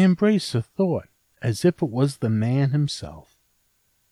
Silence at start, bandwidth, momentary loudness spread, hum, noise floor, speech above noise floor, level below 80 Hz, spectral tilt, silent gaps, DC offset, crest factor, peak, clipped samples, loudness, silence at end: 0 s; 13.5 kHz; 9 LU; none; -67 dBFS; 46 dB; -56 dBFS; -7 dB/octave; none; under 0.1%; 16 dB; -6 dBFS; under 0.1%; -23 LUFS; 0.9 s